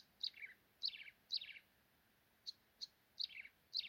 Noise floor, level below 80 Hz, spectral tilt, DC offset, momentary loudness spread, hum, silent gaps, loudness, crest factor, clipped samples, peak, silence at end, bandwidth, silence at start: -76 dBFS; -90 dBFS; 1 dB/octave; under 0.1%; 11 LU; none; none; -48 LUFS; 22 dB; under 0.1%; -30 dBFS; 0 s; 16.5 kHz; 0 s